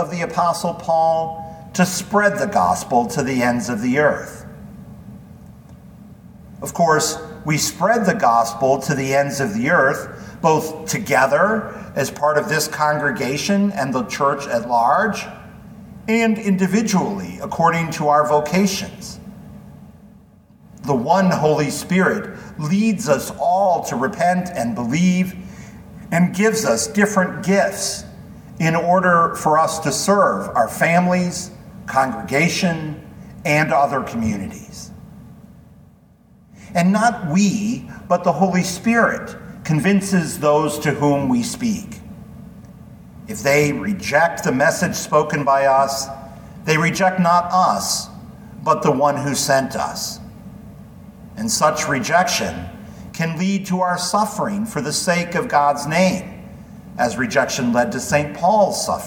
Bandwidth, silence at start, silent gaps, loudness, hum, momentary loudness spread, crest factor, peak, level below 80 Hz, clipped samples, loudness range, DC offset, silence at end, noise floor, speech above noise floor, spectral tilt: 19 kHz; 0 s; none; -18 LUFS; none; 18 LU; 18 dB; -2 dBFS; -50 dBFS; under 0.1%; 4 LU; under 0.1%; 0 s; -50 dBFS; 32 dB; -4.5 dB/octave